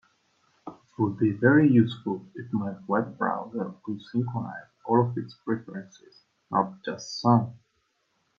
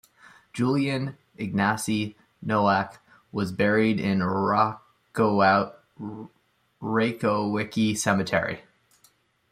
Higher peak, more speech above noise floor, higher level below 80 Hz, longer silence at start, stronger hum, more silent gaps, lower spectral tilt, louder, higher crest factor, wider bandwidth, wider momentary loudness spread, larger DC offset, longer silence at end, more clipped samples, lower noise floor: about the same, -6 dBFS vs -6 dBFS; first, 47 dB vs 39 dB; second, -70 dBFS vs -64 dBFS; about the same, 0.65 s vs 0.55 s; neither; neither; first, -7.5 dB/octave vs -5.5 dB/octave; about the same, -26 LUFS vs -25 LUFS; about the same, 20 dB vs 18 dB; second, 7.2 kHz vs 14.5 kHz; about the same, 18 LU vs 16 LU; neither; about the same, 0.8 s vs 0.9 s; neither; first, -73 dBFS vs -63 dBFS